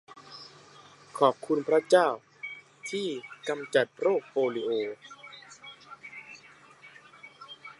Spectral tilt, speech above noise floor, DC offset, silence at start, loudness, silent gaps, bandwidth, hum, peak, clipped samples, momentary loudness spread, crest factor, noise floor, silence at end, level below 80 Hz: -4.5 dB/octave; 27 dB; under 0.1%; 0.1 s; -28 LUFS; none; 11.5 kHz; none; -8 dBFS; under 0.1%; 24 LU; 22 dB; -54 dBFS; 0.1 s; -84 dBFS